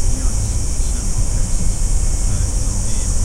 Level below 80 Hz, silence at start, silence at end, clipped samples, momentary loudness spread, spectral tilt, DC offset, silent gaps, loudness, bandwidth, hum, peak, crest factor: -18 dBFS; 0 s; 0 s; under 0.1%; 1 LU; -4 dB/octave; under 0.1%; none; -21 LUFS; 14 kHz; none; -4 dBFS; 10 dB